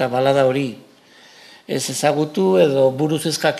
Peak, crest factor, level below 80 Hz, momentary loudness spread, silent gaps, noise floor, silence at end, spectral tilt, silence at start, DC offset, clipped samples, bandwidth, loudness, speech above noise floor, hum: -2 dBFS; 18 dB; -66 dBFS; 9 LU; none; -48 dBFS; 0 s; -5 dB/octave; 0 s; under 0.1%; under 0.1%; 14.5 kHz; -18 LUFS; 30 dB; none